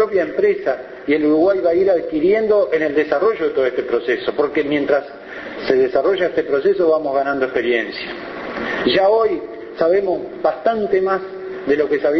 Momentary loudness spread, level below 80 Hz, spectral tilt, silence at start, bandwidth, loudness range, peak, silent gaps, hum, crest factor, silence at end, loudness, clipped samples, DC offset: 11 LU; -54 dBFS; -6.5 dB/octave; 0 s; 6.2 kHz; 2 LU; -2 dBFS; none; none; 16 dB; 0 s; -18 LUFS; under 0.1%; under 0.1%